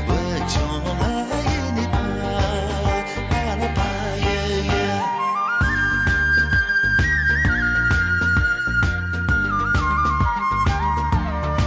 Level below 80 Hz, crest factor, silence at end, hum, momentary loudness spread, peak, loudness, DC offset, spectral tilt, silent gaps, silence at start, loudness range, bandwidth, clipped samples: -28 dBFS; 10 dB; 0 s; none; 6 LU; -10 dBFS; -20 LUFS; under 0.1%; -5.5 dB/octave; none; 0 s; 5 LU; 8 kHz; under 0.1%